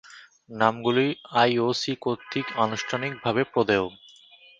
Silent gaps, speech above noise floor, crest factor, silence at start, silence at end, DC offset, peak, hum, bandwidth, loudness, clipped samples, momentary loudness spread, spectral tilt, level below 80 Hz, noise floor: none; 28 dB; 22 dB; 0.05 s; 0.65 s; under 0.1%; -4 dBFS; none; 7.8 kHz; -25 LUFS; under 0.1%; 8 LU; -5 dB/octave; -64 dBFS; -53 dBFS